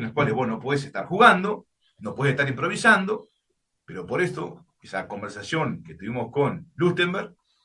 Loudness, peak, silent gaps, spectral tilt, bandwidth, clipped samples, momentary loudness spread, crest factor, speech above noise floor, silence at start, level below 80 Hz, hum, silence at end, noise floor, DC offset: -23 LUFS; -2 dBFS; none; -5.5 dB/octave; 11.5 kHz; under 0.1%; 18 LU; 22 dB; 52 dB; 0 s; -64 dBFS; none; 0.35 s; -76 dBFS; under 0.1%